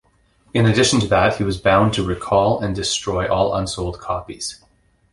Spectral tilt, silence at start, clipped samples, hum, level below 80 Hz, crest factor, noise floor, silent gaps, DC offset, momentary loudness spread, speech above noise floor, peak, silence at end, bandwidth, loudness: -4.5 dB/octave; 0.55 s; under 0.1%; none; -38 dBFS; 16 dB; -58 dBFS; none; under 0.1%; 11 LU; 39 dB; -2 dBFS; 0.6 s; 11.5 kHz; -19 LUFS